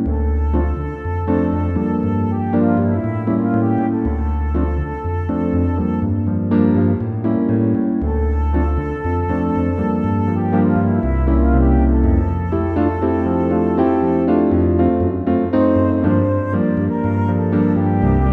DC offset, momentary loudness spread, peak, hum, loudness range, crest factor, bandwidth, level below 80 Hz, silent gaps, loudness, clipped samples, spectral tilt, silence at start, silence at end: under 0.1%; 5 LU; -2 dBFS; none; 2 LU; 14 dB; 4.1 kHz; -24 dBFS; none; -18 LUFS; under 0.1%; -11.5 dB/octave; 0 s; 0 s